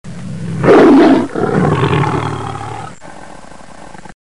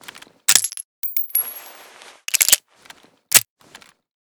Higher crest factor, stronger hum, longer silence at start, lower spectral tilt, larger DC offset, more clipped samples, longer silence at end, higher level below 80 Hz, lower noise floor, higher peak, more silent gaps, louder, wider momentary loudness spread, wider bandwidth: second, 14 dB vs 22 dB; neither; about the same, 0.05 s vs 0.15 s; first, -7.5 dB/octave vs 2.5 dB/octave; first, 2% vs under 0.1%; second, under 0.1% vs 0.1%; second, 0.05 s vs 0.8 s; first, -40 dBFS vs -64 dBFS; second, -35 dBFS vs -48 dBFS; about the same, 0 dBFS vs 0 dBFS; second, none vs 0.85-1.02 s; first, -11 LUFS vs -17 LUFS; first, 20 LU vs 16 LU; second, 11 kHz vs over 20 kHz